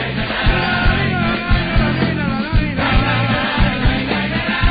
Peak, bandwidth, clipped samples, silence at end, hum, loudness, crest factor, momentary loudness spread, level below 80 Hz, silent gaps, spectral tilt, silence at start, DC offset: -4 dBFS; 5 kHz; under 0.1%; 0 s; none; -17 LUFS; 12 dB; 3 LU; -22 dBFS; none; -9.5 dB/octave; 0 s; under 0.1%